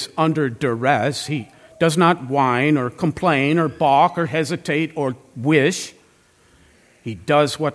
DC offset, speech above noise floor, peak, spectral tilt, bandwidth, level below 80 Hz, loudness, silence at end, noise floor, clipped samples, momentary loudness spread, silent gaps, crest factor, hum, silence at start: under 0.1%; 37 dB; -2 dBFS; -5.5 dB/octave; 11 kHz; -58 dBFS; -19 LUFS; 0 s; -55 dBFS; under 0.1%; 10 LU; none; 18 dB; none; 0 s